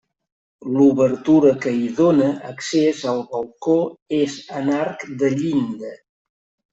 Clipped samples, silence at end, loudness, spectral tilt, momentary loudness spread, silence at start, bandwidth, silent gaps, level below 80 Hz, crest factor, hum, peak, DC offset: under 0.1%; 0.75 s; -19 LUFS; -6.5 dB/octave; 12 LU; 0.65 s; 8 kHz; 4.02-4.06 s; -60 dBFS; 16 dB; none; -4 dBFS; under 0.1%